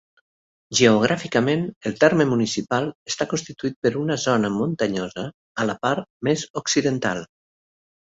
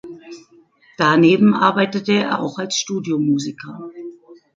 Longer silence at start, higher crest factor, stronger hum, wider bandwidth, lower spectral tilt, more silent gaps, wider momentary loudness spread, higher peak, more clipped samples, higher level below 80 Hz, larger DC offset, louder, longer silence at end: first, 0.7 s vs 0.05 s; about the same, 20 dB vs 18 dB; neither; about the same, 8 kHz vs 7.6 kHz; about the same, -4.5 dB/octave vs -5 dB/octave; first, 1.76-1.81 s, 2.95-3.06 s, 3.76-3.82 s, 5.34-5.55 s, 6.10-6.20 s, 6.50-6.54 s vs none; second, 10 LU vs 22 LU; about the same, -2 dBFS vs -2 dBFS; neither; about the same, -60 dBFS vs -64 dBFS; neither; second, -22 LUFS vs -17 LUFS; first, 0.9 s vs 0.25 s